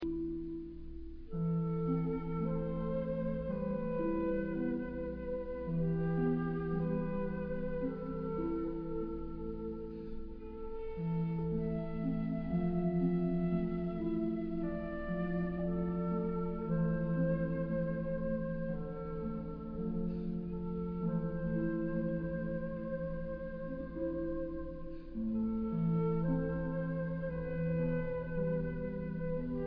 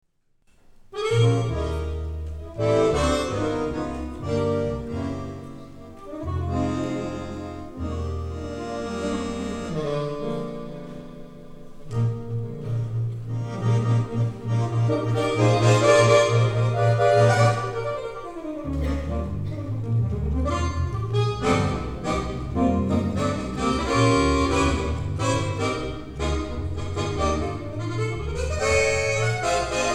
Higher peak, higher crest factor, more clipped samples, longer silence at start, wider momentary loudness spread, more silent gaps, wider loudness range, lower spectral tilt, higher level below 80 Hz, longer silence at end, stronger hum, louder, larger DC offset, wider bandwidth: second, -22 dBFS vs -4 dBFS; second, 14 dB vs 20 dB; neither; second, 0 s vs 0.85 s; second, 8 LU vs 14 LU; neither; second, 4 LU vs 10 LU; first, -10 dB/octave vs -6 dB/octave; second, -48 dBFS vs -36 dBFS; about the same, 0 s vs 0 s; neither; second, -37 LUFS vs -24 LUFS; neither; second, 4.9 kHz vs 11.5 kHz